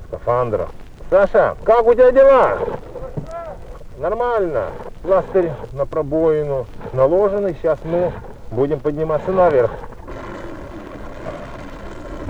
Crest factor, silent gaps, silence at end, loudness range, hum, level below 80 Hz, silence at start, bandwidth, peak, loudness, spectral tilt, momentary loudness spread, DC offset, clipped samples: 16 dB; none; 0 s; 6 LU; none; -36 dBFS; 0 s; 7.8 kHz; 0 dBFS; -17 LUFS; -8 dB/octave; 20 LU; under 0.1%; under 0.1%